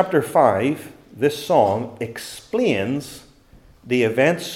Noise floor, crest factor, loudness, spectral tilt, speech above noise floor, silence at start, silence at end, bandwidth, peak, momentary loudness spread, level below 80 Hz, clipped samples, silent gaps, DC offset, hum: -50 dBFS; 18 dB; -20 LUFS; -5.5 dB/octave; 30 dB; 0 s; 0 s; 16.5 kHz; -2 dBFS; 13 LU; -58 dBFS; under 0.1%; none; under 0.1%; none